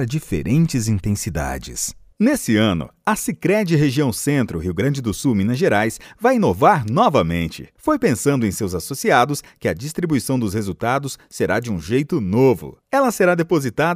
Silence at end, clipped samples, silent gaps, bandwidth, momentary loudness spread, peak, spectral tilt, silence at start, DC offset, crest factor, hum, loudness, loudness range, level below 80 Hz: 0 s; under 0.1%; none; 16 kHz; 8 LU; 0 dBFS; -5.5 dB/octave; 0 s; under 0.1%; 18 dB; none; -19 LUFS; 3 LU; -44 dBFS